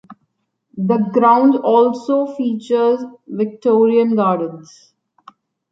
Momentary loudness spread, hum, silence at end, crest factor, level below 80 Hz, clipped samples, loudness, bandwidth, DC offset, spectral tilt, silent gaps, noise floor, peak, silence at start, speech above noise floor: 10 LU; none; 1.1 s; 14 dB; -68 dBFS; under 0.1%; -16 LUFS; 7.6 kHz; under 0.1%; -8 dB/octave; none; -69 dBFS; -2 dBFS; 0.1 s; 54 dB